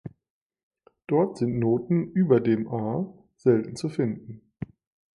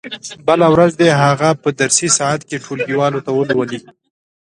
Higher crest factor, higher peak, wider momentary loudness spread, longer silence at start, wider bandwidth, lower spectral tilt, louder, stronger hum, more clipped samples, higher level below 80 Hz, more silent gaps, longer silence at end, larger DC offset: about the same, 20 dB vs 16 dB; second, -8 dBFS vs 0 dBFS; first, 19 LU vs 11 LU; about the same, 0.05 s vs 0.05 s; about the same, 11.5 kHz vs 11.5 kHz; first, -8.5 dB/octave vs -4 dB/octave; second, -25 LUFS vs -14 LUFS; neither; neither; second, -60 dBFS vs -54 dBFS; first, 0.30-0.50 s, 0.63-0.71 s vs none; second, 0.55 s vs 0.75 s; neither